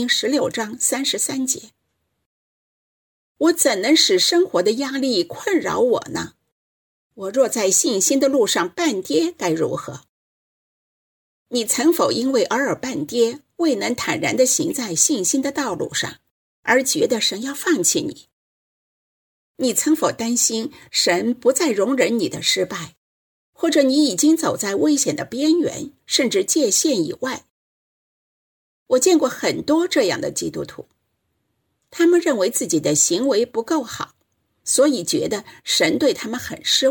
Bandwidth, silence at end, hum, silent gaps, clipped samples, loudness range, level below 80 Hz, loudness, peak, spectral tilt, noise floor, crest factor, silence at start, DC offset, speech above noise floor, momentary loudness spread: 19 kHz; 0 s; none; 2.26-3.35 s, 6.52-7.10 s, 10.09-11.46 s, 16.31-16.63 s, 18.33-19.55 s, 22.97-23.53 s, 27.50-28.86 s; under 0.1%; 3 LU; -64 dBFS; -19 LUFS; -2 dBFS; -2.5 dB/octave; -73 dBFS; 18 dB; 0 s; under 0.1%; 54 dB; 10 LU